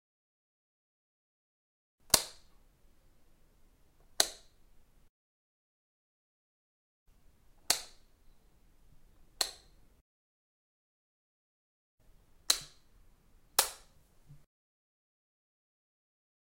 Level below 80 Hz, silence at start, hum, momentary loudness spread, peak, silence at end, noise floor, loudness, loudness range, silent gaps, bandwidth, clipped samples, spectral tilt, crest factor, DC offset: -64 dBFS; 2.15 s; none; 25 LU; -6 dBFS; 2.15 s; -64 dBFS; -31 LUFS; 9 LU; 5.09-7.06 s, 10.01-11.98 s; 16 kHz; under 0.1%; 0.5 dB/octave; 36 dB; under 0.1%